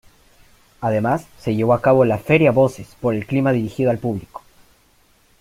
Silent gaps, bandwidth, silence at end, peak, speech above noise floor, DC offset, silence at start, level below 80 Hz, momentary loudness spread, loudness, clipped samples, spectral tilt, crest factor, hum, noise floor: none; 16 kHz; 1.05 s; -2 dBFS; 39 dB; under 0.1%; 0.8 s; -52 dBFS; 11 LU; -19 LUFS; under 0.1%; -8 dB/octave; 18 dB; none; -56 dBFS